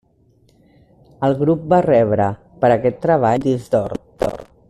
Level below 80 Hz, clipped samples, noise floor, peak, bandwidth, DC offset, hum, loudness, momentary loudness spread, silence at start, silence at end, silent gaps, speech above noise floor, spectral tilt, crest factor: -48 dBFS; under 0.1%; -56 dBFS; -4 dBFS; 13 kHz; under 0.1%; none; -17 LUFS; 9 LU; 1.2 s; 0.25 s; none; 40 dB; -8.5 dB/octave; 14 dB